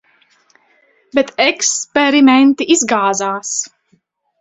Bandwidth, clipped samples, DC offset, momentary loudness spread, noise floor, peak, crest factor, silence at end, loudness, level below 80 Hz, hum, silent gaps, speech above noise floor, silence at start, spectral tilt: 8.2 kHz; under 0.1%; under 0.1%; 11 LU; -59 dBFS; 0 dBFS; 16 dB; 0.75 s; -13 LUFS; -60 dBFS; none; none; 46 dB; 1.15 s; -1.5 dB/octave